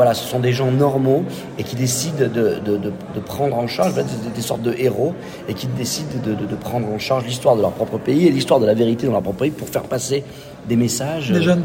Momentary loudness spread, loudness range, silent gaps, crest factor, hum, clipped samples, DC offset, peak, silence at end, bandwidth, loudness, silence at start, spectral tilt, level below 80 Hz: 9 LU; 4 LU; none; 16 dB; none; under 0.1%; under 0.1%; -2 dBFS; 0 s; 16.5 kHz; -19 LUFS; 0 s; -5.5 dB/octave; -52 dBFS